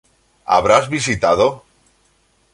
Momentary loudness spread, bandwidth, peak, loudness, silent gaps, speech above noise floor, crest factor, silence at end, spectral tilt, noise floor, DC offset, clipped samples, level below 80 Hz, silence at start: 15 LU; 11.5 kHz; 0 dBFS; -16 LUFS; none; 44 dB; 18 dB; 0.95 s; -4 dB/octave; -59 dBFS; under 0.1%; under 0.1%; -46 dBFS; 0.5 s